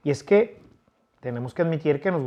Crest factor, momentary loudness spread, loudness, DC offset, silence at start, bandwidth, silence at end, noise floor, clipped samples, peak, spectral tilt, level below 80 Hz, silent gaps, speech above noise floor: 18 dB; 13 LU; -24 LUFS; under 0.1%; 0.05 s; 10 kHz; 0 s; -63 dBFS; under 0.1%; -6 dBFS; -7.5 dB/octave; -66 dBFS; none; 40 dB